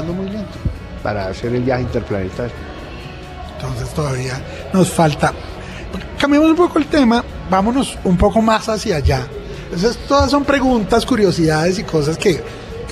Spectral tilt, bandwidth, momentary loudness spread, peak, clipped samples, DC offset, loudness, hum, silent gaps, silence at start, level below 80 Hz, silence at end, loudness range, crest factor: -6 dB/octave; 14.5 kHz; 16 LU; -2 dBFS; under 0.1%; under 0.1%; -17 LUFS; none; none; 0 s; -30 dBFS; 0 s; 7 LU; 14 dB